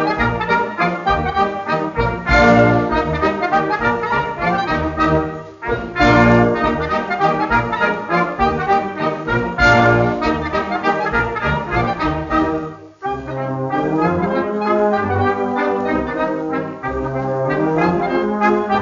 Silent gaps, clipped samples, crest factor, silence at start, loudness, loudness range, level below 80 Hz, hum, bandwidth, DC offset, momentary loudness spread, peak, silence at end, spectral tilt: none; under 0.1%; 16 dB; 0 s; -17 LUFS; 4 LU; -34 dBFS; none; 7.4 kHz; under 0.1%; 9 LU; 0 dBFS; 0 s; -5 dB/octave